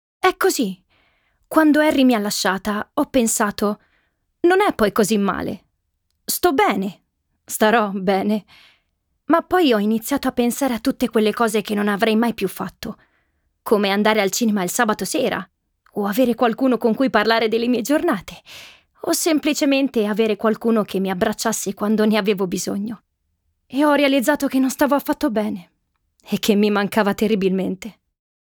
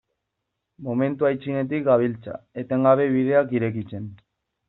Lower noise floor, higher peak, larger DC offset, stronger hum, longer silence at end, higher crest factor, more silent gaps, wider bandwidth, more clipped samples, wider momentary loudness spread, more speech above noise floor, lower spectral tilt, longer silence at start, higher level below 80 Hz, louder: second, -71 dBFS vs -80 dBFS; about the same, -2 dBFS vs -4 dBFS; neither; neither; about the same, 0.5 s vs 0.55 s; about the same, 18 dB vs 20 dB; neither; first, over 20 kHz vs 4.1 kHz; neither; second, 12 LU vs 16 LU; second, 53 dB vs 58 dB; second, -4 dB/octave vs -7.5 dB/octave; second, 0.25 s vs 0.8 s; first, -54 dBFS vs -64 dBFS; first, -19 LUFS vs -22 LUFS